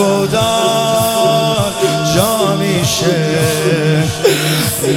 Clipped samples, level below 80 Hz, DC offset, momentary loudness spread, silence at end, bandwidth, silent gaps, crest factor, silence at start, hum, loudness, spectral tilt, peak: under 0.1%; -42 dBFS; under 0.1%; 2 LU; 0 s; 17.5 kHz; none; 12 dB; 0 s; none; -13 LUFS; -4.5 dB/octave; 0 dBFS